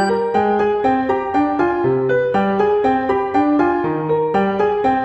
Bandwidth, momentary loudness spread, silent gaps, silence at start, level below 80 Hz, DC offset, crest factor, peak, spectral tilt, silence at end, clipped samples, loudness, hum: 8.4 kHz; 2 LU; none; 0 s; -48 dBFS; under 0.1%; 12 dB; -4 dBFS; -7.5 dB/octave; 0 s; under 0.1%; -17 LUFS; none